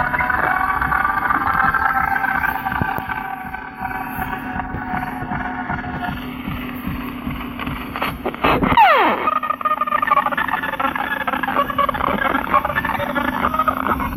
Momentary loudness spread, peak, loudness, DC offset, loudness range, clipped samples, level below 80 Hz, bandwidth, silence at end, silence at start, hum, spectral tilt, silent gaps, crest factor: 10 LU; -2 dBFS; -19 LUFS; under 0.1%; 9 LU; under 0.1%; -38 dBFS; 16 kHz; 0 s; 0 s; none; -6 dB/octave; none; 18 dB